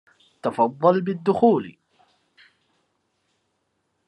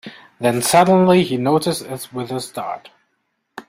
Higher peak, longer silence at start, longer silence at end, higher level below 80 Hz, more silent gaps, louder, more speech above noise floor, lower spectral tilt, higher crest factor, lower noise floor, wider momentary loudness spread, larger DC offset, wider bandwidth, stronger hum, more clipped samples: about the same, -4 dBFS vs -2 dBFS; first, 0.45 s vs 0.05 s; first, 2.35 s vs 0.1 s; second, -74 dBFS vs -58 dBFS; neither; second, -21 LUFS vs -17 LUFS; about the same, 53 dB vs 53 dB; first, -8.5 dB/octave vs -5 dB/octave; about the same, 20 dB vs 18 dB; about the same, -73 dBFS vs -70 dBFS; second, 11 LU vs 16 LU; neither; second, 10 kHz vs 16 kHz; neither; neither